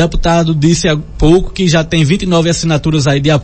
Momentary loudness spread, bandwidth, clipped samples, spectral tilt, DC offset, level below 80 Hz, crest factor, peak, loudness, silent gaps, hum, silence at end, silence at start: 2 LU; 8.8 kHz; under 0.1%; -5.5 dB/octave; under 0.1%; -22 dBFS; 10 dB; 0 dBFS; -11 LUFS; none; none; 0 s; 0 s